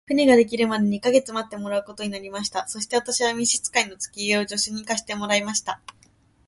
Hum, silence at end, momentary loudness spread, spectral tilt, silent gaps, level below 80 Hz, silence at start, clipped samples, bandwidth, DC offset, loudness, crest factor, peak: none; 0.7 s; 12 LU; -2.5 dB/octave; none; -60 dBFS; 0.1 s; under 0.1%; 11.5 kHz; under 0.1%; -23 LUFS; 20 dB; -4 dBFS